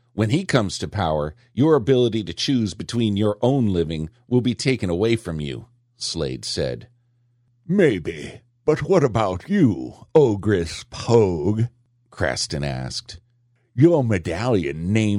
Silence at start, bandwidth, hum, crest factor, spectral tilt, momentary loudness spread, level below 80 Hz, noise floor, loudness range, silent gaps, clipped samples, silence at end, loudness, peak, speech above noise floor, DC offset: 0.15 s; 11.5 kHz; none; 18 dB; -6 dB/octave; 12 LU; -46 dBFS; -63 dBFS; 5 LU; none; under 0.1%; 0 s; -21 LUFS; -4 dBFS; 43 dB; under 0.1%